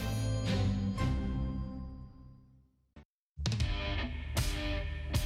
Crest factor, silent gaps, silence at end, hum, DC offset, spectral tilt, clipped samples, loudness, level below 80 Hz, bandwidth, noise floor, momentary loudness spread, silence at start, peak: 18 dB; 3.05-3.35 s; 0 s; none; under 0.1%; -5.5 dB/octave; under 0.1%; -35 LUFS; -40 dBFS; 16 kHz; -65 dBFS; 15 LU; 0 s; -16 dBFS